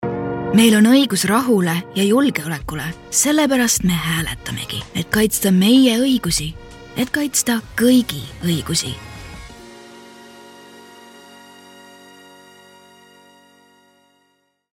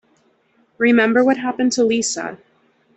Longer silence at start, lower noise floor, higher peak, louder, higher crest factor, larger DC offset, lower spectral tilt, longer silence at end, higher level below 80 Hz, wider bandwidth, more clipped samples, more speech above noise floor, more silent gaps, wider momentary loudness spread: second, 0 s vs 0.8 s; first, -64 dBFS vs -60 dBFS; about the same, -2 dBFS vs -4 dBFS; about the same, -17 LUFS vs -17 LUFS; about the same, 18 dB vs 16 dB; neither; about the same, -4 dB/octave vs -3.5 dB/octave; first, 4.3 s vs 0.6 s; first, -44 dBFS vs -64 dBFS; first, 17 kHz vs 8.4 kHz; neither; first, 48 dB vs 43 dB; neither; first, 15 LU vs 10 LU